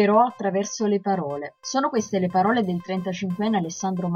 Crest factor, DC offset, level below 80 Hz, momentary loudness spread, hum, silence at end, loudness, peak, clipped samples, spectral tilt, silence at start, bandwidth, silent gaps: 16 dB; under 0.1%; -64 dBFS; 7 LU; none; 0 s; -24 LUFS; -6 dBFS; under 0.1%; -5.5 dB/octave; 0 s; 7.2 kHz; none